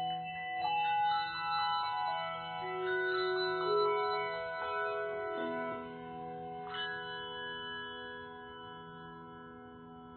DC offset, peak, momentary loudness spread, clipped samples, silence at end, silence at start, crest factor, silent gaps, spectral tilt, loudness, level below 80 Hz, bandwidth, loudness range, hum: under 0.1%; -22 dBFS; 17 LU; under 0.1%; 0 s; 0 s; 16 dB; none; -1 dB/octave; -36 LUFS; -70 dBFS; 4.6 kHz; 9 LU; none